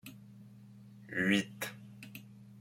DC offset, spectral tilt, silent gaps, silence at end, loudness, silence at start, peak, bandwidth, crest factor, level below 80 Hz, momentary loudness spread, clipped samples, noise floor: under 0.1%; -4.5 dB/octave; none; 0 s; -34 LUFS; 0.05 s; -16 dBFS; 16.5 kHz; 22 dB; -74 dBFS; 25 LU; under 0.1%; -55 dBFS